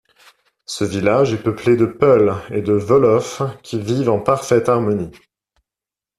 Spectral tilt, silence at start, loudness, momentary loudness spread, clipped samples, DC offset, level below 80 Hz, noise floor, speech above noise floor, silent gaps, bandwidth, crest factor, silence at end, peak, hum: -6.5 dB/octave; 0.7 s; -17 LUFS; 10 LU; under 0.1%; under 0.1%; -52 dBFS; -89 dBFS; 73 dB; none; 13 kHz; 18 dB; 1.1 s; 0 dBFS; none